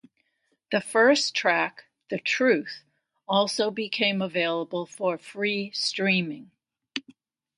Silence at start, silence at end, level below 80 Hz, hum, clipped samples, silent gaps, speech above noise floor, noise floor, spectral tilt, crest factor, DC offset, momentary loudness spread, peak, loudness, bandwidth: 0.7 s; 0.6 s; -76 dBFS; none; under 0.1%; none; 48 dB; -73 dBFS; -3.5 dB/octave; 20 dB; under 0.1%; 16 LU; -8 dBFS; -25 LUFS; 11.5 kHz